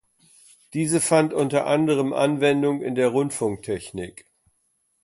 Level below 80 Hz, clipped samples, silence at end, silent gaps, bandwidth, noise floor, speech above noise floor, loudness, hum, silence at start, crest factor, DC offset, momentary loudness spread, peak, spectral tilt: -60 dBFS; under 0.1%; 0.95 s; none; 12 kHz; -70 dBFS; 48 dB; -22 LUFS; none; 0.75 s; 18 dB; under 0.1%; 12 LU; -6 dBFS; -5 dB/octave